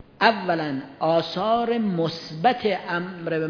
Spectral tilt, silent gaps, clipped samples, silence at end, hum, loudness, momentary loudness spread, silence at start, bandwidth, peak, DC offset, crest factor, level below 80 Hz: -6.5 dB/octave; none; under 0.1%; 0 s; none; -24 LUFS; 7 LU; 0.2 s; 5.4 kHz; -4 dBFS; under 0.1%; 20 dB; -64 dBFS